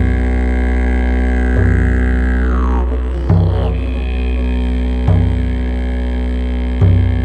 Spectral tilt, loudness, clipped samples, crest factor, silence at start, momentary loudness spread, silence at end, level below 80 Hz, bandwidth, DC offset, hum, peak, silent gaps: -9 dB/octave; -16 LUFS; under 0.1%; 12 dB; 0 s; 6 LU; 0 s; -16 dBFS; 4.5 kHz; under 0.1%; none; 0 dBFS; none